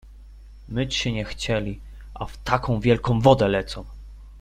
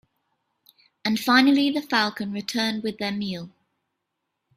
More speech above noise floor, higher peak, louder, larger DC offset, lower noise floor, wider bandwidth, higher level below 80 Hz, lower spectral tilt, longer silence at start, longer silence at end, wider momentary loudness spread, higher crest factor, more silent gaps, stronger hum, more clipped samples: second, 21 dB vs 57 dB; about the same, -2 dBFS vs -4 dBFS; about the same, -23 LUFS vs -23 LUFS; neither; second, -44 dBFS vs -80 dBFS; second, 12.5 kHz vs 15.5 kHz; first, -40 dBFS vs -68 dBFS; first, -6 dB/octave vs -4 dB/octave; second, 0.05 s vs 1.05 s; second, 0 s vs 1.1 s; first, 19 LU vs 13 LU; about the same, 22 dB vs 22 dB; neither; neither; neither